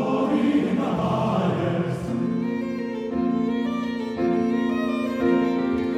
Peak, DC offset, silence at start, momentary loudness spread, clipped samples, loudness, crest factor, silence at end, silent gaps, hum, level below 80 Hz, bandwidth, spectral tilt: -10 dBFS; under 0.1%; 0 s; 6 LU; under 0.1%; -24 LUFS; 14 dB; 0 s; none; none; -56 dBFS; 10 kHz; -8 dB/octave